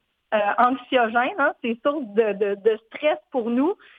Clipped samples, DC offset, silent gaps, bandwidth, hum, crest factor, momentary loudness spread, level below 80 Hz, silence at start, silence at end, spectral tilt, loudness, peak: under 0.1%; under 0.1%; none; 4.7 kHz; none; 20 dB; 5 LU; -72 dBFS; 0.3 s; 0.25 s; -7.5 dB/octave; -23 LUFS; -2 dBFS